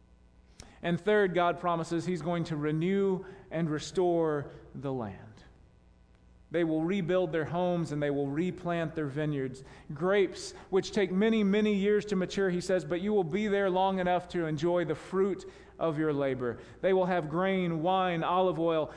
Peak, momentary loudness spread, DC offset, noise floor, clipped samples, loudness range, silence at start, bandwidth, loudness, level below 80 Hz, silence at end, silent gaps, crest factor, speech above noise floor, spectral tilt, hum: -14 dBFS; 9 LU; under 0.1%; -60 dBFS; under 0.1%; 5 LU; 0.6 s; 10.5 kHz; -30 LUFS; -60 dBFS; 0 s; none; 16 dB; 30 dB; -6.5 dB/octave; none